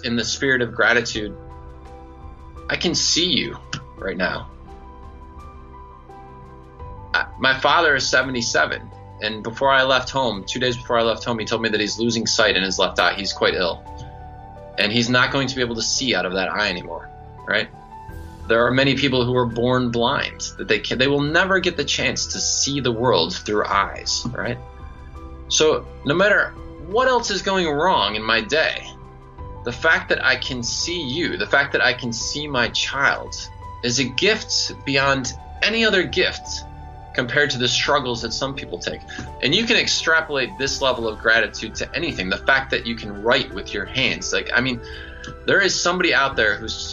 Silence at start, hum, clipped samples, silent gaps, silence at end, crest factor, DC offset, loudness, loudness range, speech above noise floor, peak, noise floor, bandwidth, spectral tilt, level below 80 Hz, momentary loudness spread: 0 s; none; under 0.1%; none; 0 s; 20 dB; under 0.1%; -20 LUFS; 3 LU; 20 dB; -2 dBFS; -41 dBFS; 9.2 kHz; -3 dB/octave; -42 dBFS; 16 LU